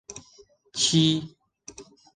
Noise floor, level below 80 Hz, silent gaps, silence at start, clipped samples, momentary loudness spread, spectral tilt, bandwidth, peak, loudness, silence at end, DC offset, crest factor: -57 dBFS; -62 dBFS; none; 0.1 s; under 0.1%; 25 LU; -4 dB/octave; 10 kHz; -8 dBFS; -22 LUFS; 0.35 s; under 0.1%; 20 dB